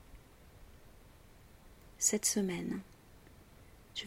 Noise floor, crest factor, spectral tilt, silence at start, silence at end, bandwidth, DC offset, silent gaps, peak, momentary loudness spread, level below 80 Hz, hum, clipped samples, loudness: -58 dBFS; 24 dB; -2.5 dB/octave; 0.1 s; 0 s; 16 kHz; under 0.1%; none; -16 dBFS; 15 LU; -62 dBFS; none; under 0.1%; -34 LUFS